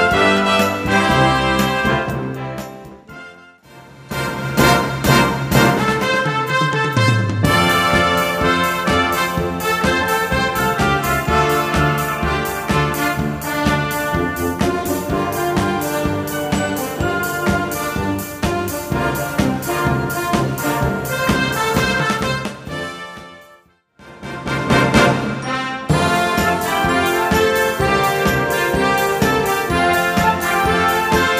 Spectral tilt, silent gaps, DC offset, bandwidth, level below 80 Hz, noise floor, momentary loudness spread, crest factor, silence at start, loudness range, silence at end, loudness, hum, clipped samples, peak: -4.5 dB/octave; none; under 0.1%; 15.5 kHz; -34 dBFS; -50 dBFS; 8 LU; 18 dB; 0 s; 5 LU; 0 s; -17 LUFS; none; under 0.1%; 0 dBFS